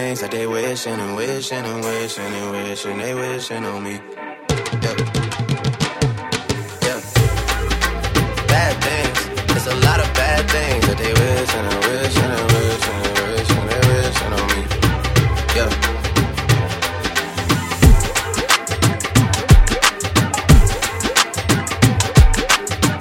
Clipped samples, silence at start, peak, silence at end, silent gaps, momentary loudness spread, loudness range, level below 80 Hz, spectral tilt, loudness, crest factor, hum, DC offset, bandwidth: under 0.1%; 0 s; 0 dBFS; 0 s; none; 10 LU; 8 LU; -22 dBFS; -4.5 dB/octave; -17 LUFS; 16 dB; none; under 0.1%; 17 kHz